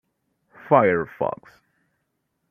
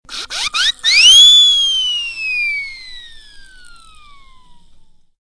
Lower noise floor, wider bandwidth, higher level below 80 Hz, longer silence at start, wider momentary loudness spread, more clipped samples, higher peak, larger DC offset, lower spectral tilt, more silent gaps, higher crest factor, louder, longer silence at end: first, -75 dBFS vs -43 dBFS; second, 5.4 kHz vs 11 kHz; second, -64 dBFS vs -44 dBFS; first, 0.65 s vs 0.1 s; second, 12 LU vs 19 LU; neither; about the same, -2 dBFS vs 0 dBFS; neither; first, -9.5 dB/octave vs 4 dB/octave; neither; first, 22 dB vs 14 dB; second, -21 LUFS vs -8 LUFS; second, 1.2 s vs 1.8 s